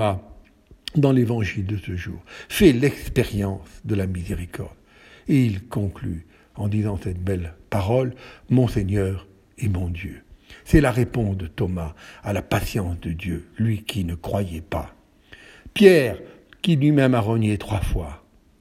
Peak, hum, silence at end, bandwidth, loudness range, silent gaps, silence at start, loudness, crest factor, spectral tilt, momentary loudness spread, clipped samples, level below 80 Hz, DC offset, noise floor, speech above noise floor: 0 dBFS; none; 0.45 s; 16 kHz; 6 LU; none; 0 s; -23 LUFS; 22 dB; -7 dB/octave; 17 LU; under 0.1%; -38 dBFS; under 0.1%; -50 dBFS; 29 dB